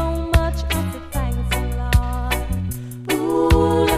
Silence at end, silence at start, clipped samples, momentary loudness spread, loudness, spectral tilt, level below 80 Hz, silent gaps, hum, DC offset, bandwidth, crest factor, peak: 0 s; 0 s; under 0.1%; 10 LU; -21 LUFS; -6 dB/octave; -24 dBFS; none; none; under 0.1%; 15.5 kHz; 18 dB; -2 dBFS